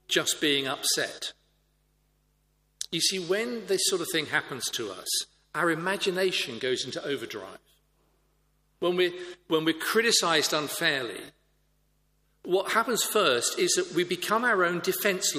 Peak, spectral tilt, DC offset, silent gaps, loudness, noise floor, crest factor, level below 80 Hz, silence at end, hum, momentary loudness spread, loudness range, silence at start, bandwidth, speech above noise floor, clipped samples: -8 dBFS; -2 dB/octave; under 0.1%; none; -26 LUFS; -70 dBFS; 20 dB; -70 dBFS; 0 s; 50 Hz at -70 dBFS; 10 LU; 5 LU; 0.1 s; 15.5 kHz; 42 dB; under 0.1%